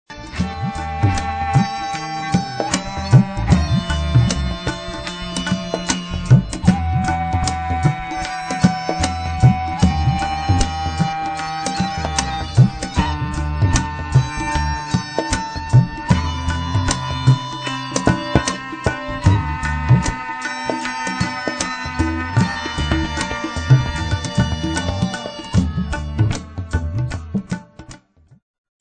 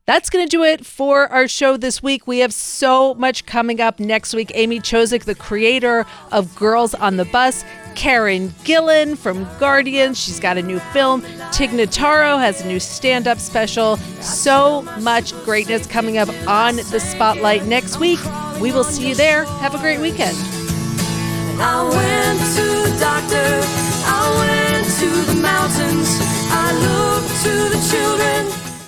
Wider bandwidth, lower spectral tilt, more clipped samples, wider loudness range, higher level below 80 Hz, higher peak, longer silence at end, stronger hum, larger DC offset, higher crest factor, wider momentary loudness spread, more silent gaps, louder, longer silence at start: second, 9.4 kHz vs over 20 kHz; first, -5.5 dB/octave vs -3.5 dB/octave; neither; about the same, 3 LU vs 2 LU; first, -28 dBFS vs -40 dBFS; about the same, 0 dBFS vs -2 dBFS; first, 0.85 s vs 0 s; neither; neither; about the same, 18 dB vs 16 dB; about the same, 9 LU vs 7 LU; neither; second, -20 LUFS vs -16 LUFS; about the same, 0.1 s vs 0.1 s